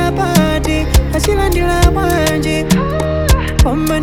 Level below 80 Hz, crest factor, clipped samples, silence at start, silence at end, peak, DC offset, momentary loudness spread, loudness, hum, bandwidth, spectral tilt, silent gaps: -16 dBFS; 12 dB; under 0.1%; 0 s; 0 s; 0 dBFS; under 0.1%; 3 LU; -14 LUFS; none; 18 kHz; -5.5 dB/octave; none